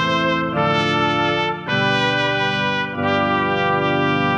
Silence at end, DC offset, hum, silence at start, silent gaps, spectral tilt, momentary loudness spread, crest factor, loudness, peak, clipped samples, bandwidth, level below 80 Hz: 0 s; under 0.1%; none; 0 s; none; -5.5 dB/octave; 3 LU; 14 dB; -18 LUFS; -4 dBFS; under 0.1%; 10 kHz; -50 dBFS